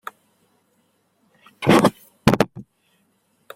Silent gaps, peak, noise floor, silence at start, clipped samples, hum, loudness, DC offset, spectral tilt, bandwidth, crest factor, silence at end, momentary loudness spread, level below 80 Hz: none; -2 dBFS; -65 dBFS; 1.6 s; under 0.1%; none; -19 LUFS; under 0.1%; -6 dB/octave; 16.5 kHz; 22 dB; 0.95 s; 9 LU; -50 dBFS